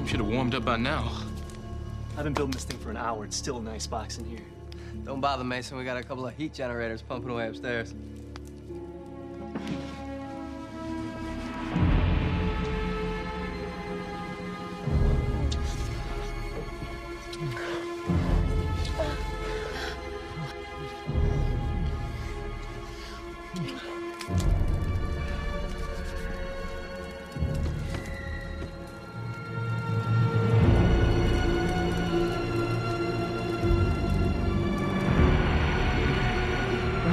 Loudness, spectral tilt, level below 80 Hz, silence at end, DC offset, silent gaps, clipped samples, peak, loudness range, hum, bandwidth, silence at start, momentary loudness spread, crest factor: -30 LUFS; -6.5 dB/octave; -34 dBFS; 0 s; under 0.1%; none; under 0.1%; -10 dBFS; 9 LU; none; 14 kHz; 0 s; 13 LU; 18 dB